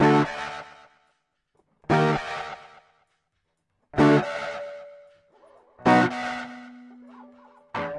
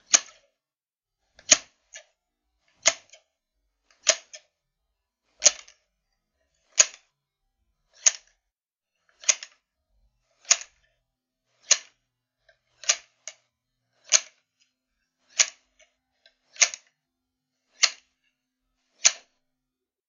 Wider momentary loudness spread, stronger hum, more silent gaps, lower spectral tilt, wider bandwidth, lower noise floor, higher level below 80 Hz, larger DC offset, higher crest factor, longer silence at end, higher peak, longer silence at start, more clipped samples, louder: about the same, 24 LU vs 22 LU; neither; neither; first, -6.5 dB/octave vs 4 dB/octave; first, 11 kHz vs 8 kHz; second, -76 dBFS vs under -90 dBFS; first, -58 dBFS vs -74 dBFS; neither; second, 18 dB vs 30 dB; second, 0 s vs 0.95 s; second, -8 dBFS vs 0 dBFS; about the same, 0 s vs 0.1 s; neither; about the same, -24 LUFS vs -23 LUFS